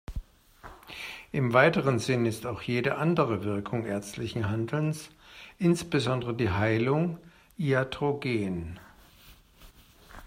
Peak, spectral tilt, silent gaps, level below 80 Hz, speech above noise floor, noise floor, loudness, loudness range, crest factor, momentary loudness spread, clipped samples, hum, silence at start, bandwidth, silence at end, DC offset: -8 dBFS; -6.5 dB/octave; none; -52 dBFS; 28 dB; -55 dBFS; -28 LUFS; 3 LU; 22 dB; 18 LU; under 0.1%; none; 0.1 s; 16 kHz; 0 s; under 0.1%